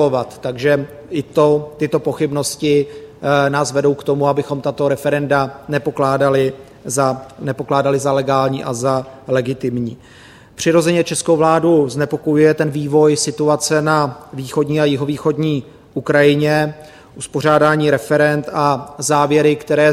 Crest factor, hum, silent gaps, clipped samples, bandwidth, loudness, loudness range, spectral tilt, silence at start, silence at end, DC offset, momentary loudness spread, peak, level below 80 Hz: 16 dB; none; none; under 0.1%; 15.5 kHz; -16 LUFS; 3 LU; -5.5 dB/octave; 0 s; 0 s; under 0.1%; 9 LU; 0 dBFS; -52 dBFS